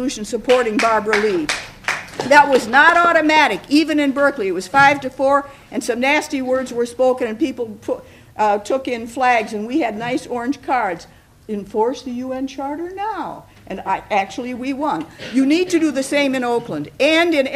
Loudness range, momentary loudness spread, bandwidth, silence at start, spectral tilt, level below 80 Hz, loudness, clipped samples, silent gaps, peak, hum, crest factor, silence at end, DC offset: 9 LU; 13 LU; 15 kHz; 0 s; -3.5 dB/octave; -52 dBFS; -18 LUFS; under 0.1%; none; 0 dBFS; none; 18 dB; 0 s; under 0.1%